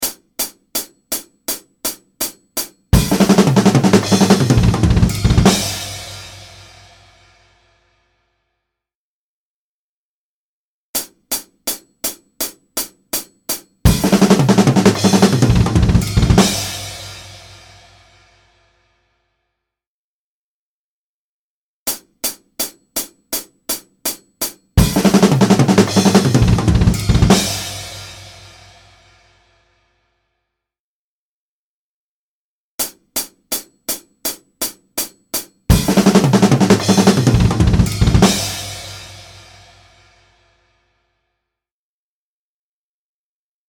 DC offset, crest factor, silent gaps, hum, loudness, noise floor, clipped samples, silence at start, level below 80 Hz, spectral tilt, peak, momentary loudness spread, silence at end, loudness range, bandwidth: under 0.1%; 18 dB; 8.95-10.94 s, 19.87-21.86 s, 30.79-32.78 s; none; -16 LUFS; under -90 dBFS; under 0.1%; 0 s; -28 dBFS; -5 dB/octave; 0 dBFS; 13 LU; 4.45 s; 16 LU; over 20 kHz